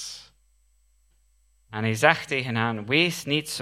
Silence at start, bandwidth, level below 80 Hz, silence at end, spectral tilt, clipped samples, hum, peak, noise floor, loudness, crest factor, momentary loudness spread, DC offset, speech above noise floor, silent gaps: 0 s; 16 kHz; -64 dBFS; 0 s; -4 dB/octave; under 0.1%; none; 0 dBFS; -64 dBFS; -23 LUFS; 26 dB; 17 LU; under 0.1%; 40 dB; none